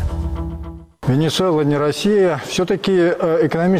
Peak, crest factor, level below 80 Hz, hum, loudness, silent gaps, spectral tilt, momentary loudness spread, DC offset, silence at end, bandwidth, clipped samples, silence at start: -8 dBFS; 10 dB; -32 dBFS; none; -17 LUFS; none; -6 dB/octave; 11 LU; under 0.1%; 0 s; 16 kHz; under 0.1%; 0 s